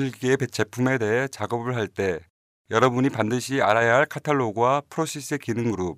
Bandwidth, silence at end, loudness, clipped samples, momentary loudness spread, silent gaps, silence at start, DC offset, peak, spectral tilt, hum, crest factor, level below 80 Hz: 15.5 kHz; 0 s; -23 LUFS; under 0.1%; 8 LU; 2.30-2.65 s; 0 s; under 0.1%; -4 dBFS; -5.5 dB/octave; none; 20 dB; -62 dBFS